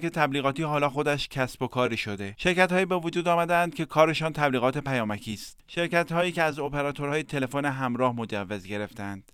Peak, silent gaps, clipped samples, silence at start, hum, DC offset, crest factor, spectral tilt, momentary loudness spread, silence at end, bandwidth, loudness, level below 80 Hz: -6 dBFS; none; under 0.1%; 0 s; none; under 0.1%; 20 dB; -5.5 dB/octave; 11 LU; 0.1 s; 16.5 kHz; -27 LUFS; -54 dBFS